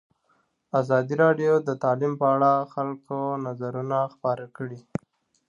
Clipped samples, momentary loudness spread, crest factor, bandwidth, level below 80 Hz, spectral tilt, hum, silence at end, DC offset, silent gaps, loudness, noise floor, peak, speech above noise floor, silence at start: under 0.1%; 14 LU; 18 dB; 7.4 kHz; -68 dBFS; -8.5 dB/octave; none; 0.7 s; under 0.1%; none; -25 LUFS; -69 dBFS; -8 dBFS; 44 dB; 0.75 s